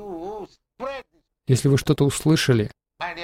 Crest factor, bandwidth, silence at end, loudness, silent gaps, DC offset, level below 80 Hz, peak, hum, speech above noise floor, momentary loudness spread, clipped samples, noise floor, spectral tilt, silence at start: 16 dB; 16 kHz; 0 s; -21 LUFS; none; under 0.1%; -48 dBFS; -6 dBFS; none; 26 dB; 18 LU; under 0.1%; -45 dBFS; -5.5 dB/octave; 0 s